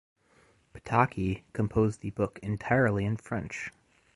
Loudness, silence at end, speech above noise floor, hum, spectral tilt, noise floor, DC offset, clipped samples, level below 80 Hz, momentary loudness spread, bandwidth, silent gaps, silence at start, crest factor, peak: -30 LUFS; 0.45 s; 35 dB; none; -7.5 dB/octave; -64 dBFS; under 0.1%; under 0.1%; -52 dBFS; 12 LU; 11.5 kHz; none; 0.75 s; 22 dB; -8 dBFS